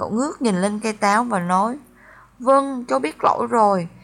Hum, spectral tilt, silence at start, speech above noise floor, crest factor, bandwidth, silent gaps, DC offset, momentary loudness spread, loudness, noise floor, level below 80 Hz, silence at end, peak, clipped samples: none; -5.5 dB/octave; 0 s; 29 dB; 16 dB; 13 kHz; none; under 0.1%; 6 LU; -20 LUFS; -48 dBFS; -60 dBFS; 0.05 s; -4 dBFS; under 0.1%